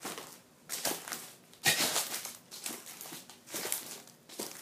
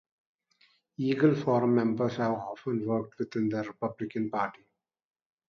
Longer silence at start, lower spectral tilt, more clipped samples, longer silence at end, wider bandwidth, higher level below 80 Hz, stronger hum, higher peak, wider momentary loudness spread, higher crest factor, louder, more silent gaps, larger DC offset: second, 0 s vs 1 s; second, -0.5 dB/octave vs -8.5 dB/octave; neither; second, 0 s vs 0.95 s; first, 16 kHz vs 6.8 kHz; second, -80 dBFS vs -72 dBFS; neither; about the same, -10 dBFS vs -12 dBFS; first, 19 LU vs 10 LU; first, 28 dB vs 18 dB; second, -35 LUFS vs -30 LUFS; neither; neither